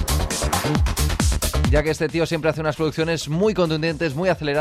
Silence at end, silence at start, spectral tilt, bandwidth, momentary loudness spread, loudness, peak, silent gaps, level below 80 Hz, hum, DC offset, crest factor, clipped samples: 0 s; 0 s; -5 dB/octave; 16 kHz; 3 LU; -21 LUFS; -6 dBFS; none; -28 dBFS; none; under 0.1%; 14 dB; under 0.1%